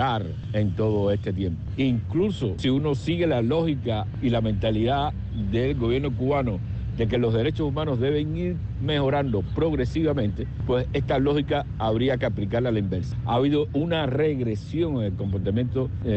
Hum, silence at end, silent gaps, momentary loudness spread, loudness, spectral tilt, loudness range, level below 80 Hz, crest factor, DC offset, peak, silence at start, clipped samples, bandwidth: none; 0 s; none; 5 LU; -25 LUFS; -8.5 dB/octave; 1 LU; -38 dBFS; 10 dB; under 0.1%; -14 dBFS; 0 s; under 0.1%; 8.2 kHz